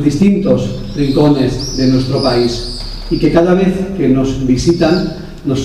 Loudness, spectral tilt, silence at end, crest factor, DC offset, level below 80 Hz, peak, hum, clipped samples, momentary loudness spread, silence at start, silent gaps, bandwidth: -13 LUFS; -6.5 dB/octave; 0 s; 12 dB; 0.3%; -28 dBFS; 0 dBFS; none; under 0.1%; 10 LU; 0 s; none; 13 kHz